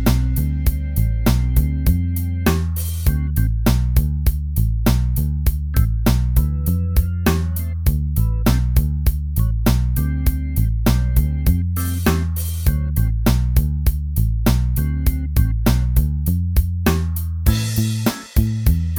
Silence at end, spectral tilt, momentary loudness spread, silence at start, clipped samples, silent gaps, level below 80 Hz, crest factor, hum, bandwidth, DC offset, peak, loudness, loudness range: 0 s; -6.5 dB/octave; 3 LU; 0 s; under 0.1%; none; -20 dBFS; 16 dB; none; over 20 kHz; under 0.1%; -2 dBFS; -19 LUFS; 1 LU